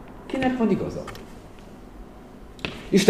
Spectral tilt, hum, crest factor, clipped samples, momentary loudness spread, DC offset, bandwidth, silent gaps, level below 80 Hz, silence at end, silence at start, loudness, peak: -5.5 dB/octave; none; 24 dB; under 0.1%; 22 LU; 0.1%; 14.5 kHz; none; -46 dBFS; 0 s; 0 s; -26 LUFS; 0 dBFS